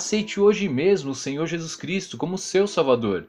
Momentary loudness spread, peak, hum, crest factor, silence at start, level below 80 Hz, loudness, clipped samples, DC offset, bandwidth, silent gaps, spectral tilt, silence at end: 9 LU; -6 dBFS; none; 16 dB; 0 s; -58 dBFS; -23 LUFS; under 0.1%; under 0.1%; 11 kHz; none; -4.5 dB/octave; 0 s